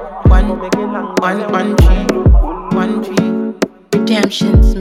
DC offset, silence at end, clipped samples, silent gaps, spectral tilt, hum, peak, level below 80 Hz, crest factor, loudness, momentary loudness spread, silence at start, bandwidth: under 0.1%; 0 s; under 0.1%; none; -6.5 dB/octave; none; 0 dBFS; -14 dBFS; 12 dB; -14 LUFS; 6 LU; 0 s; 13 kHz